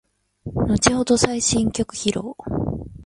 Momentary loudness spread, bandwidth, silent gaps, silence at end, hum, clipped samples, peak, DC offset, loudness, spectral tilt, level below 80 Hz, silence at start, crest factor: 11 LU; 11.5 kHz; none; 0 s; none; under 0.1%; 0 dBFS; under 0.1%; -21 LUFS; -4 dB/octave; -38 dBFS; 0.45 s; 22 dB